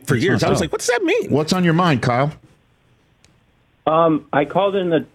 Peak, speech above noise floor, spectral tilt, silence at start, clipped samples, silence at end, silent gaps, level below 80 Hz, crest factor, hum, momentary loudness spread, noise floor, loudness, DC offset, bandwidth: -4 dBFS; 41 dB; -5.5 dB/octave; 0.05 s; under 0.1%; 0.1 s; none; -48 dBFS; 16 dB; none; 4 LU; -58 dBFS; -18 LUFS; under 0.1%; 15.5 kHz